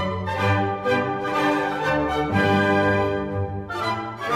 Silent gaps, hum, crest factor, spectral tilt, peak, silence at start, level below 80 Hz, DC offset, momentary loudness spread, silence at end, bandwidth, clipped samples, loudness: none; none; 16 dB; -6.5 dB/octave; -6 dBFS; 0 s; -46 dBFS; under 0.1%; 8 LU; 0 s; 15 kHz; under 0.1%; -22 LUFS